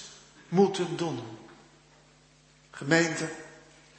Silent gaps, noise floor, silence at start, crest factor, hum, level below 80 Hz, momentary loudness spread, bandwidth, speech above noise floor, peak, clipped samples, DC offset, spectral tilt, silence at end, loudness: none; -60 dBFS; 0 s; 24 dB; none; -70 dBFS; 23 LU; 8.8 kHz; 32 dB; -8 dBFS; under 0.1%; under 0.1%; -5 dB/octave; 0.4 s; -28 LUFS